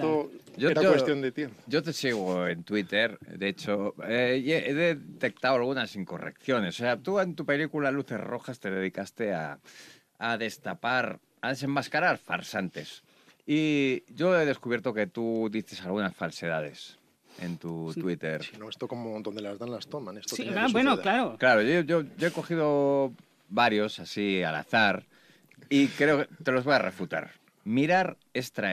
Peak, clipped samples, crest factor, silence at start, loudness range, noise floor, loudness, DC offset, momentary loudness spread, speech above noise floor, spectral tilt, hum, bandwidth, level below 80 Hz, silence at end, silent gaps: -8 dBFS; under 0.1%; 20 dB; 0 s; 7 LU; -58 dBFS; -28 LUFS; under 0.1%; 13 LU; 30 dB; -5.5 dB/octave; none; 14.5 kHz; -76 dBFS; 0 s; none